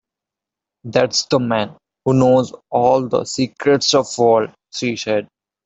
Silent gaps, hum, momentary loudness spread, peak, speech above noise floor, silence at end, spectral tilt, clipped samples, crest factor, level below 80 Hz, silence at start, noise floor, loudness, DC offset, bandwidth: none; none; 9 LU; 0 dBFS; 69 dB; 0.4 s; -4.5 dB/octave; under 0.1%; 18 dB; -56 dBFS; 0.85 s; -86 dBFS; -17 LUFS; under 0.1%; 8.2 kHz